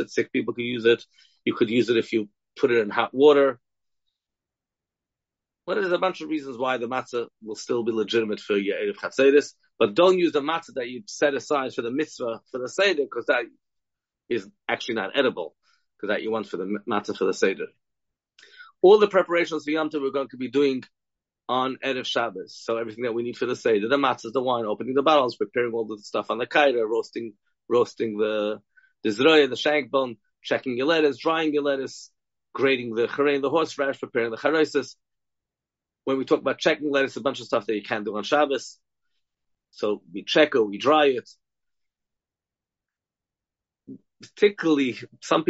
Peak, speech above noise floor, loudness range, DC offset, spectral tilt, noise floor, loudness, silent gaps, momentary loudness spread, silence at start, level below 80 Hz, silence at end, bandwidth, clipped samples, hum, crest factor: -4 dBFS; 66 dB; 5 LU; under 0.1%; -2.5 dB/octave; -90 dBFS; -24 LUFS; none; 12 LU; 0 s; -74 dBFS; 0.05 s; 8 kHz; under 0.1%; none; 20 dB